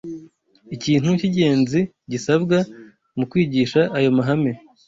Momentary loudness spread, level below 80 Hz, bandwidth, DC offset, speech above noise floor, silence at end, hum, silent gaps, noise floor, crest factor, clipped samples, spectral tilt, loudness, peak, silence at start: 12 LU; -56 dBFS; 7.8 kHz; under 0.1%; 30 dB; 0.3 s; none; none; -49 dBFS; 16 dB; under 0.1%; -6.5 dB/octave; -20 LUFS; -4 dBFS; 0.05 s